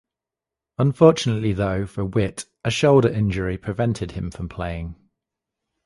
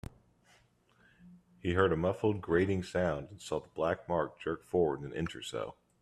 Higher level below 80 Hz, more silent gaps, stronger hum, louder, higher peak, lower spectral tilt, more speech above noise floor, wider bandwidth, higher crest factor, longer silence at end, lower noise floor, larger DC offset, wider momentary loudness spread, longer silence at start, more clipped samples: first, -42 dBFS vs -60 dBFS; neither; neither; first, -21 LUFS vs -33 LUFS; first, 0 dBFS vs -14 dBFS; about the same, -6.5 dB/octave vs -6.5 dB/octave; first, 67 dB vs 35 dB; about the same, 11.5 kHz vs 12.5 kHz; about the same, 22 dB vs 20 dB; first, 0.95 s vs 0.3 s; first, -88 dBFS vs -68 dBFS; neither; first, 14 LU vs 10 LU; second, 0.8 s vs 1.25 s; neither